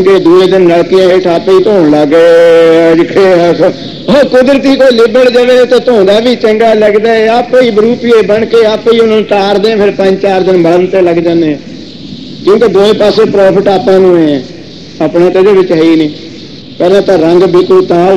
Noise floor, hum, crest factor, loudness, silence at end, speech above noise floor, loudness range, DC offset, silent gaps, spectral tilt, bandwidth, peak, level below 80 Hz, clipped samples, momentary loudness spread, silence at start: -26 dBFS; none; 6 dB; -6 LUFS; 0 s; 21 dB; 3 LU; 1%; none; -6.5 dB/octave; 11.5 kHz; 0 dBFS; -40 dBFS; 5%; 8 LU; 0 s